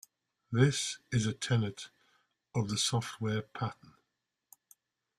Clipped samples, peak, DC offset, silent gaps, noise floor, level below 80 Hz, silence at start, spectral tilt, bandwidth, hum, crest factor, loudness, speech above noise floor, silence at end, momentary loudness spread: under 0.1%; -12 dBFS; under 0.1%; none; -85 dBFS; -64 dBFS; 0.5 s; -4.5 dB/octave; 14.5 kHz; none; 22 dB; -33 LUFS; 53 dB; 1.45 s; 11 LU